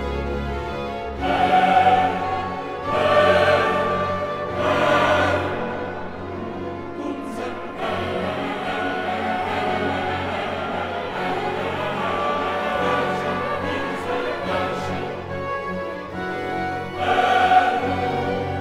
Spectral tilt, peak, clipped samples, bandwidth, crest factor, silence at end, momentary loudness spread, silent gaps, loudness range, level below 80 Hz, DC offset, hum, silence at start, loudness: -5.5 dB/octave; -4 dBFS; under 0.1%; 14 kHz; 18 dB; 0 s; 12 LU; none; 7 LU; -42 dBFS; under 0.1%; none; 0 s; -22 LUFS